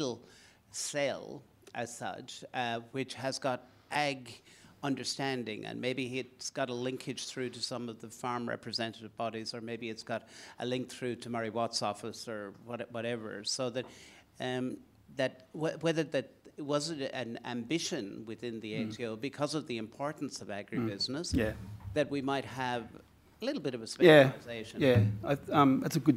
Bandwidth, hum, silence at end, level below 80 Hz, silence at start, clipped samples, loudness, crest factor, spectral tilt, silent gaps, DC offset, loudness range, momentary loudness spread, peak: 16 kHz; none; 0 s; -60 dBFS; 0 s; under 0.1%; -34 LUFS; 28 dB; -5 dB/octave; none; under 0.1%; 9 LU; 13 LU; -6 dBFS